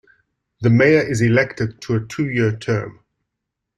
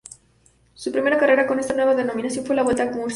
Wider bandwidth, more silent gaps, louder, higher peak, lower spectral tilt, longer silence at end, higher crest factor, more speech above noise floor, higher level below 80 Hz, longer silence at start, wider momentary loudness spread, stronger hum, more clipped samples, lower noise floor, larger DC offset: about the same, 11 kHz vs 11.5 kHz; neither; about the same, -18 LUFS vs -20 LUFS; about the same, -2 dBFS vs -4 dBFS; first, -7 dB/octave vs -4 dB/octave; first, 0.85 s vs 0 s; about the same, 18 dB vs 16 dB; first, 63 dB vs 38 dB; about the same, -52 dBFS vs -56 dBFS; second, 0.6 s vs 0.8 s; about the same, 10 LU vs 9 LU; neither; neither; first, -80 dBFS vs -58 dBFS; neither